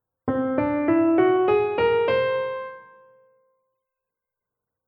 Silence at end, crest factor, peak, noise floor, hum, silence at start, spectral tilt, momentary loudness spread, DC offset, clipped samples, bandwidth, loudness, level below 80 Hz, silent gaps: 2.05 s; 16 dB; -8 dBFS; -86 dBFS; none; 0.25 s; -9.5 dB/octave; 10 LU; under 0.1%; under 0.1%; 5.2 kHz; -22 LUFS; -58 dBFS; none